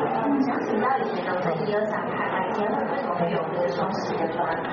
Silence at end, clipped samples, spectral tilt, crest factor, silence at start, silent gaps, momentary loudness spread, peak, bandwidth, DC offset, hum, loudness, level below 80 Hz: 0 s; under 0.1%; -5 dB/octave; 14 dB; 0 s; none; 3 LU; -12 dBFS; 6.8 kHz; under 0.1%; none; -25 LUFS; -64 dBFS